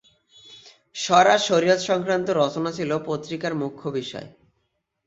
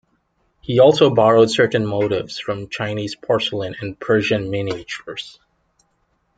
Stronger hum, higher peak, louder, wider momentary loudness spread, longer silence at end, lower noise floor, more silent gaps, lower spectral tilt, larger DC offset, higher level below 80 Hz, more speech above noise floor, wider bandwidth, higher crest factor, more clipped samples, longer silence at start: neither; about the same, -2 dBFS vs -2 dBFS; second, -22 LUFS vs -18 LUFS; second, 13 LU vs 16 LU; second, 0.75 s vs 1.1 s; first, -74 dBFS vs -66 dBFS; neither; second, -4 dB/octave vs -5.5 dB/octave; neither; second, -66 dBFS vs -54 dBFS; first, 52 dB vs 48 dB; second, 8 kHz vs 9.2 kHz; about the same, 22 dB vs 18 dB; neither; second, 0.5 s vs 0.7 s